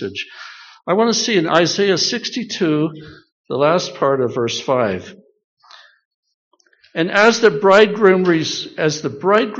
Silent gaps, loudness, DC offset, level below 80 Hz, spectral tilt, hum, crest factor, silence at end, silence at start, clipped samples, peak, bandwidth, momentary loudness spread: 3.32-3.44 s, 5.44-5.57 s, 6.05-6.23 s, 6.34-6.51 s; -16 LUFS; under 0.1%; -62 dBFS; -3 dB/octave; none; 18 dB; 0 s; 0 s; under 0.1%; 0 dBFS; 7.6 kHz; 15 LU